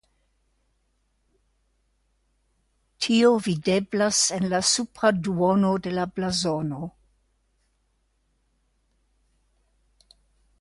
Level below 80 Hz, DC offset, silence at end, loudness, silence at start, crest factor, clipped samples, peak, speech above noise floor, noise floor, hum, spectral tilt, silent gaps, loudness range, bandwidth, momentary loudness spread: -60 dBFS; under 0.1%; 3.7 s; -23 LUFS; 3 s; 20 dB; under 0.1%; -6 dBFS; 47 dB; -70 dBFS; none; -4 dB/octave; none; 11 LU; 11.5 kHz; 9 LU